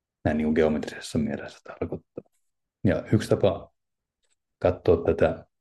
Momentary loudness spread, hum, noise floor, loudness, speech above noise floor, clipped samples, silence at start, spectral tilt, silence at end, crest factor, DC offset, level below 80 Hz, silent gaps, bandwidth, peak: 14 LU; none; -83 dBFS; -26 LUFS; 58 dB; under 0.1%; 0.25 s; -7 dB/octave; 0.2 s; 20 dB; under 0.1%; -52 dBFS; none; 12.5 kHz; -8 dBFS